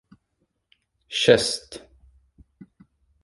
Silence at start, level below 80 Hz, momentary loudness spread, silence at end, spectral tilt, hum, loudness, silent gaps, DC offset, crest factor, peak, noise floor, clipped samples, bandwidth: 1.1 s; -58 dBFS; 25 LU; 1.45 s; -3 dB/octave; none; -21 LUFS; none; under 0.1%; 26 dB; -2 dBFS; -74 dBFS; under 0.1%; 11.5 kHz